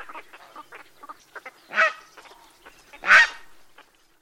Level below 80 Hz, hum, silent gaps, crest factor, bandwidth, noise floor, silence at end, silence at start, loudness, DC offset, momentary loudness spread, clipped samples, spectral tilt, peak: -64 dBFS; none; none; 24 dB; 16.5 kHz; -55 dBFS; 0.9 s; 0 s; -18 LUFS; under 0.1%; 28 LU; under 0.1%; 0.5 dB/octave; -2 dBFS